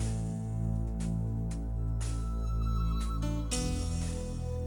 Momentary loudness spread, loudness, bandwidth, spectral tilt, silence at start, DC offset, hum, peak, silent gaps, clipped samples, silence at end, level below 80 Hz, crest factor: 3 LU; -34 LUFS; 17 kHz; -6 dB/octave; 0 s; under 0.1%; none; -18 dBFS; none; under 0.1%; 0 s; -34 dBFS; 14 dB